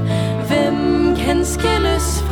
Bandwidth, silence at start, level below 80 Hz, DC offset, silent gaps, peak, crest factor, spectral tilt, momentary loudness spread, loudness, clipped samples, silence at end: 18.5 kHz; 0 s; -26 dBFS; under 0.1%; none; -4 dBFS; 12 dB; -5.5 dB/octave; 3 LU; -17 LUFS; under 0.1%; 0 s